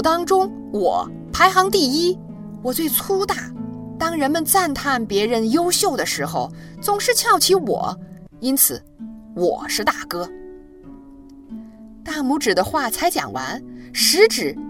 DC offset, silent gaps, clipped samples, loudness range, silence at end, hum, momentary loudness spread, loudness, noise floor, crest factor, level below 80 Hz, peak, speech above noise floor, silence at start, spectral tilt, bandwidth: under 0.1%; none; under 0.1%; 6 LU; 0 s; none; 17 LU; -19 LUFS; -42 dBFS; 20 dB; -48 dBFS; 0 dBFS; 23 dB; 0 s; -2.5 dB/octave; 16.5 kHz